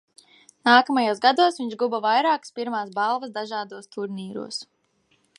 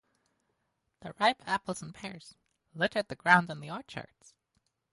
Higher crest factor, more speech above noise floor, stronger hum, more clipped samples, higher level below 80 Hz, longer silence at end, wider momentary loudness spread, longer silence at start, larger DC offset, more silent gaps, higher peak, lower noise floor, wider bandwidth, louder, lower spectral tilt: second, 20 dB vs 26 dB; second, 44 dB vs 49 dB; neither; neither; second, -80 dBFS vs -70 dBFS; second, 0.75 s vs 0.9 s; second, 16 LU vs 24 LU; second, 0.65 s vs 1.05 s; neither; neither; first, -4 dBFS vs -8 dBFS; second, -67 dBFS vs -80 dBFS; about the same, 11.5 kHz vs 11.5 kHz; first, -23 LUFS vs -30 LUFS; about the same, -3.5 dB/octave vs -4.5 dB/octave